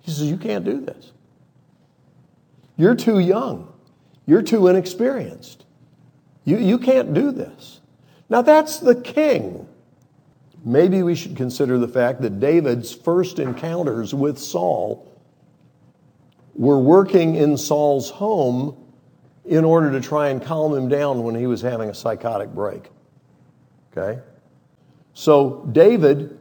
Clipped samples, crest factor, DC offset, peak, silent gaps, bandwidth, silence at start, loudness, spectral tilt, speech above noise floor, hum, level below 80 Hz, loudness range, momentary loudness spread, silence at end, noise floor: under 0.1%; 20 dB; under 0.1%; 0 dBFS; none; 19 kHz; 0.05 s; -19 LUFS; -7 dB/octave; 39 dB; none; -68 dBFS; 6 LU; 14 LU; 0.05 s; -57 dBFS